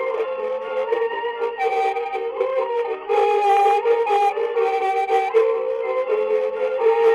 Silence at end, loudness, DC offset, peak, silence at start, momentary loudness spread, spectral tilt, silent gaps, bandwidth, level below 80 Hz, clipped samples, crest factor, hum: 0 s; -21 LUFS; under 0.1%; -6 dBFS; 0 s; 8 LU; -2.5 dB/octave; none; 11 kHz; -68 dBFS; under 0.1%; 14 dB; none